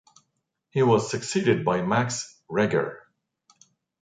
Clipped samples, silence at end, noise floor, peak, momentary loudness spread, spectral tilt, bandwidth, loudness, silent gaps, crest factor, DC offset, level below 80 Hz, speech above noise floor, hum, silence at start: under 0.1%; 1.05 s; -77 dBFS; -8 dBFS; 10 LU; -5.5 dB/octave; 9.6 kHz; -25 LUFS; none; 18 dB; under 0.1%; -64 dBFS; 54 dB; none; 0.75 s